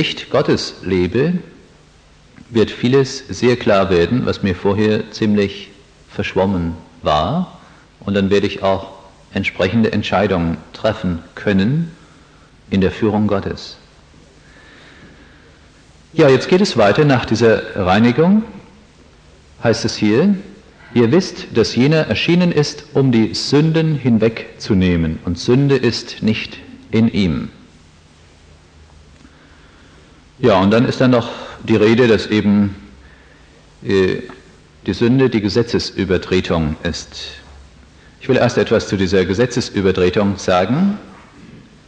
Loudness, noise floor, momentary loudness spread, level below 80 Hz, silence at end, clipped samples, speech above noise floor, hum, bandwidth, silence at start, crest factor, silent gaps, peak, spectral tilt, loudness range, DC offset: -16 LUFS; -47 dBFS; 12 LU; -42 dBFS; 0.3 s; under 0.1%; 32 dB; none; 9.4 kHz; 0 s; 16 dB; none; -2 dBFS; -6.5 dB/octave; 6 LU; under 0.1%